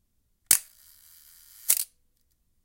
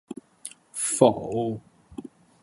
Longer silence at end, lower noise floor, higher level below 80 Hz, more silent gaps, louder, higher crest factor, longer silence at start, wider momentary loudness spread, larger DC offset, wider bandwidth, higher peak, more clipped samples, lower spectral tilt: first, 0.8 s vs 0.35 s; first, -70 dBFS vs -46 dBFS; about the same, -66 dBFS vs -62 dBFS; neither; about the same, -23 LUFS vs -24 LUFS; about the same, 28 dB vs 26 dB; first, 0.5 s vs 0.1 s; second, 15 LU vs 22 LU; neither; first, 17 kHz vs 12 kHz; about the same, -4 dBFS vs -2 dBFS; neither; second, 2 dB/octave vs -5 dB/octave